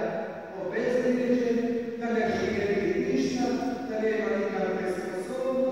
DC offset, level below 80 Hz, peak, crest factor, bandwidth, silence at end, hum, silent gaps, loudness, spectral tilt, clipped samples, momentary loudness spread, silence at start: 0.1%; -58 dBFS; -14 dBFS; 14 dB; 15.5 kHz; 0 s; none; none; -28 LUFS; -6 dB/octave; under 0.1%; 7 LU; 0 s